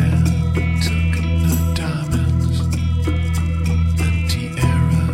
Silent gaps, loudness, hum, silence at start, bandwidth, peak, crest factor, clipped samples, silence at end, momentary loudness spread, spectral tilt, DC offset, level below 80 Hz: none; -19 LUFS; none; 0 s; 15.5 kHz; -6 dBFS; 12 dB; under 0.1%; 0 s; 3 LU; -6.5 dB/octave; under 0.1%; -24 dBFS